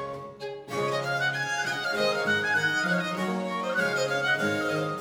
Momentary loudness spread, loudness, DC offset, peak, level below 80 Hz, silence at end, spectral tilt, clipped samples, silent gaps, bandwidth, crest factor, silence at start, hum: 8 LU; -27 LUFS; under 0.1%; -14 dBFS; -70 dBFS; 0 s; -4 dB/octave; under 0.1%; none; 18.5 kHz; 14 dB; 0 s; none